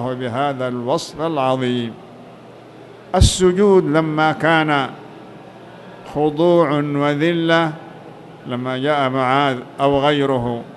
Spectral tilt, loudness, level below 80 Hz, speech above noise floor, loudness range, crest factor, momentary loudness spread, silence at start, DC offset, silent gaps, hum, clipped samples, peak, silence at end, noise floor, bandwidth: -5.5 dB/octave; -17 LUFS; -34 dBFS; 23 dB; 2 LU; 18 dB; 22 LU; 0 s; under 0.1%; none; none; under 0.1%; 0 dBFS; 0 s; -40 dBFS; 12 kHz